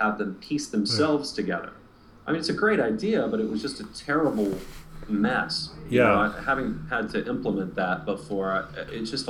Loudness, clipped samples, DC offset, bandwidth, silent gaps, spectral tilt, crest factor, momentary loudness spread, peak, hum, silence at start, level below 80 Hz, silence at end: -26 LUFS; under 0.1%; under 0.1%; 14.5 kHz; none; -5 dB/octave; 18 dB; 10 LU; -8 dBFS; none; 0 s; -50 dBFS; 0 s